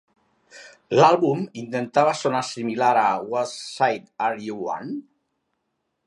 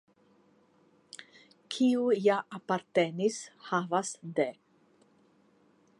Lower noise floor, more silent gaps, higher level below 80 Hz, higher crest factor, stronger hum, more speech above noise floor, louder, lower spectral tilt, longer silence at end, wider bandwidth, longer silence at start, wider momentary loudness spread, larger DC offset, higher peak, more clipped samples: first, -76 dBFS vs -66 dBFS; neither; first, -72 dBFS vs -86 dBFS; about the same, 20 dB vs 20 dB; neither; first, 54 dB vs 36 dB; first, -22 LUFS vs -30 LUFS; about the same, -5 dB/octave vs -5 dB/octave; second, 1.05 s vs 1.45 s; about the same, 11.5 kHz vs 11.5 kHz; second, 0.55 s vs 1.2 s; second, 13 LU vs 20 LU; neither; first, -2 dBFS vs -14 dBFS; neither